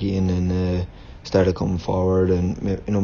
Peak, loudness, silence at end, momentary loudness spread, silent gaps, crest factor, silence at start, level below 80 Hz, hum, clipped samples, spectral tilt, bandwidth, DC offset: -4 dBFS; -22 LUFS; 0 s; 7 LU; none; 16 dB; 0 s; -38 dBFS; none; under 0.1%; -8 dB/octave; 7 kHz; under 0.1%